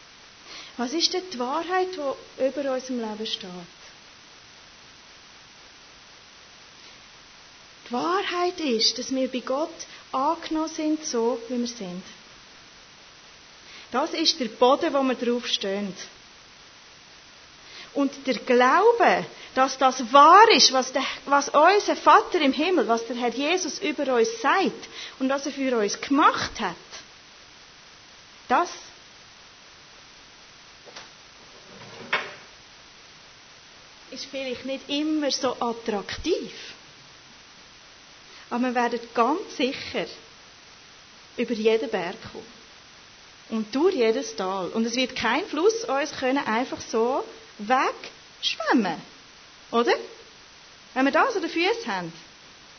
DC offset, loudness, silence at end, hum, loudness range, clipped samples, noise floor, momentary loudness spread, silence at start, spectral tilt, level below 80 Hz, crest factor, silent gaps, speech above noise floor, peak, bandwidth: under 0.1%; -23 LUFS; 0.5 s; none; 15 LU; under 0.1%; -49 dBFS; 23 LU; 0.45 s; -2.5 dB/octave; -62 dBFS; 24 dB; none; 26 dB; -2 dBFS; 6.6 kHz